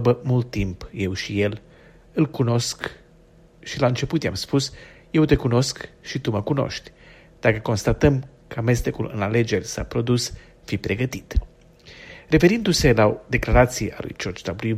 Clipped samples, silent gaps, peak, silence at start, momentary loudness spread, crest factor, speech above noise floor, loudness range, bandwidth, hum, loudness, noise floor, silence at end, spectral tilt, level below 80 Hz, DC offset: under 0.1%; none; -2 dBFS; 0 s; 13 LU; 20 dB; 30 dB; 5 LU; 15.5 kHz; none; -22 LUFS; -52 dBFS; 0 s; -5.5 dB/octave; -36 dBFS; under 0.1%